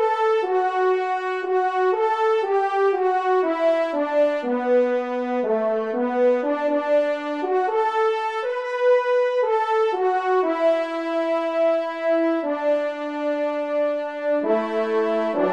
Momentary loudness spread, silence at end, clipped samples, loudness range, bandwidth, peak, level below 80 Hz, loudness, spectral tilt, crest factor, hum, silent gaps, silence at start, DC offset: 4 LU; 0 s; under 0.1%; 2 LU; 9.2 kHz; -10 dBFS; -76 dBFS; -22 LUFS; -5 dB/octave; 12 dB; none; none; 0 s; 0.1%